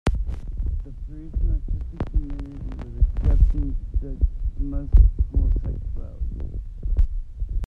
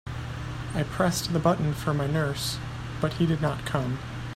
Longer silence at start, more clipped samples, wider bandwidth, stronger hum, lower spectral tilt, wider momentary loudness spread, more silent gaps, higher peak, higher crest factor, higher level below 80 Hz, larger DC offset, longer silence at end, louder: about the same, 0.05 s vs 0.05 s; neither; second, 3.9 kHz vs 15 kHz; neither; first, -8.5 dB/octave vs -5.5 dB/octave; first, 14 LU vs 10 LU; neither; first, -4 dBFS vs -8 dBFS; about the same, 18 dB vs 20 dB; first, -22 dBFS vs -44 dBFS; neither; about the same, 0 s vs 0 s; about the same, -27 LUFS vs -28 LUFS